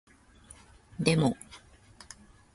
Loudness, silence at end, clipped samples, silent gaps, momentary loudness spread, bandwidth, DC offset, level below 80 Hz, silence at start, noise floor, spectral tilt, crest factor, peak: -28 LUFS; 0.95 s; under 0.1%; none; 27 LU; 11.5 kHz; under 0.1%; -58 dBFS; 1 s; -56 dBFS; -5.5 dB/octave; 26 dB; -8 dBFS